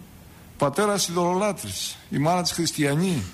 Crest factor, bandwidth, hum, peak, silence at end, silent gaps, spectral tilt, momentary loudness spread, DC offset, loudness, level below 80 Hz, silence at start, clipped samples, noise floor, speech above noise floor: 14 dB; 15.5 kHz; none; -12 dBFS; 0 s; none; -4.5 dB/octave; 6 LU; under 0.1%; -24 LUFS; -54 dBFS; 0 s; under 0.1%; -46 dBFS; 23 dB